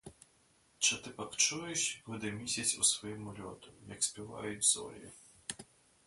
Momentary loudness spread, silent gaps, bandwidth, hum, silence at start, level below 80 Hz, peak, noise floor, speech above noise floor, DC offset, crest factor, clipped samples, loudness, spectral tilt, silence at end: 19 LU; none; 12 kHz; none; 0.05 s; -70 dBFS; -14 dBFS; -69 dBFS; 33 dB; under 0.1%; 22 dB; under 0.1%; -33 LUFS; -1 dB/octave; 0.45 s